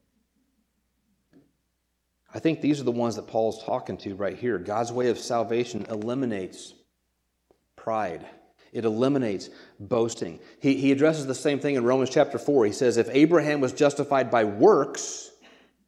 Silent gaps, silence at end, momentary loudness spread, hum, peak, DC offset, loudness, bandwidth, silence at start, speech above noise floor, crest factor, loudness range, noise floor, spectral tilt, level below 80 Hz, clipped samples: none; 0.6 s; 15 LU; none; -6 dBFS; under 0.1%; -25 LUFS; 12.5 kHz; 2.35 s; 51 dB; 20 dB; 9 LU; -76 dBFS; -5.5 dB/octave; -70 dBFS; under 0.1%